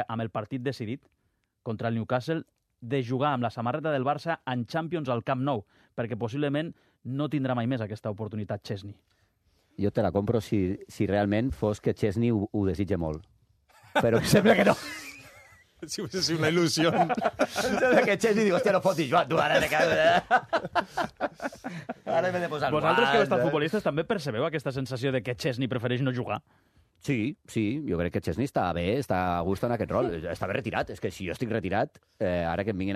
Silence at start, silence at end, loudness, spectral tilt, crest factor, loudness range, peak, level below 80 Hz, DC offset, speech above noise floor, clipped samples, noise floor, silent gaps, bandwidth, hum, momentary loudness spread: 0 s; 0 s; -28 LUFS; -5.5 dB/octave; 18 dB; 7 LU; -10 dBFS; -56 dBFS; under 0.1%; 41 dB; under 0.1%; -68 dBFS; none; 14 kHz; none; 12 LU